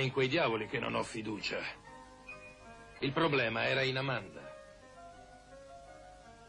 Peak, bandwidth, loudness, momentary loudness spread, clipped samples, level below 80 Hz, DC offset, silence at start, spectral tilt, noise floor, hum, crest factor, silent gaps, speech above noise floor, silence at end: -20 dBFS; 11 kHz; -33 LUFS; 23 LU; under 0.1%; -64 dBFS; under 0.1%; 0 s; -5.5 dB/octave; -55 dBFS; 50 Hz at -65 dBFS; 18 dB; none; 21 dB; 0 s